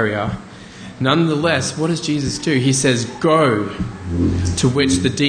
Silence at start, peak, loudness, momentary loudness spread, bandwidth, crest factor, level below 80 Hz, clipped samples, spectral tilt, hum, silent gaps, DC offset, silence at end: 0 s; -2 dBFS; -18 LUFS; 11 LU; 10 kHz; 16 dB; -38 dBFS; under 0.1%; -5 dB/octave; none; none; under 0.1%; 0 s